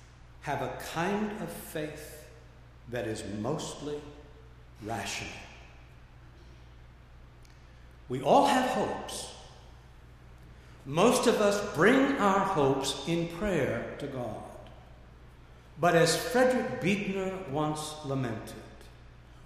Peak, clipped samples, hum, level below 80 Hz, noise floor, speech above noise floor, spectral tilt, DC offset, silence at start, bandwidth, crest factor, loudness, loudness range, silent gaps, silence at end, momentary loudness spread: -10 dBFS; under 0.1%; none; -54 dBFS; -52 dBFS; 23 dB; -4.5 dB/octave; under 0.1%; 0 s; 15.5 kHz; 22 dB; -29 LUFS; 14 LU; none; 0 s; 21 LU